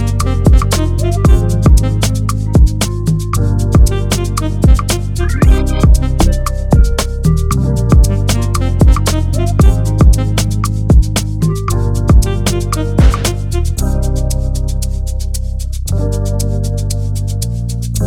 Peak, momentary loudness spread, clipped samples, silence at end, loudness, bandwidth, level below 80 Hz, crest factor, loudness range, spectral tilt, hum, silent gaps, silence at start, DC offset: 0 dBFS; 7 LU; under 0.1%; 0 s; -13 LUFS; 16 kHz; -14 dBFS; 10 dB; 5 LU; -6 dB/octave; none; none; 0 s; under 0.1%